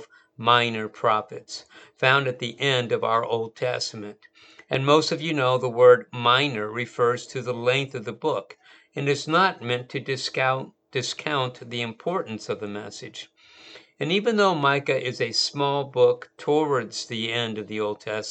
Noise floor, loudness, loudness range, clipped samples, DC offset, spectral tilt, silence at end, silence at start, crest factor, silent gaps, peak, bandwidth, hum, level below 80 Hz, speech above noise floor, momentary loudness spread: -49 dBFS; -24 LUFS; 6 LU; under 0.1%; under 0.1%; -4.5 dB/octave; 0 s; 0 s; 24 dB; none; -2 dBFS; 9 kHz; none; -74 dBFS; 25 dB; 12 LU